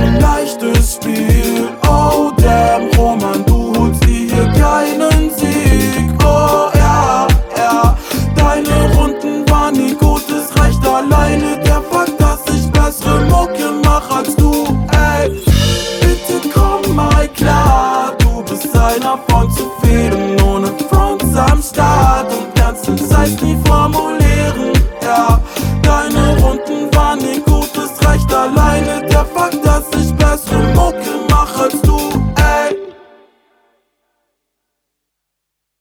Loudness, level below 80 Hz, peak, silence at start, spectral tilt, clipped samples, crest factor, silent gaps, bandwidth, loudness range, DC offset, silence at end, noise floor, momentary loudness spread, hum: -12 LUFS; -16 dBFS; 0 dBFS; 0 s; -5.5 dB/octave; under 0.1%; 12 dB; none; 19 kHz; 2 LU; under 0.1%; 2.9 s; -75 dBFS; 4 LU; none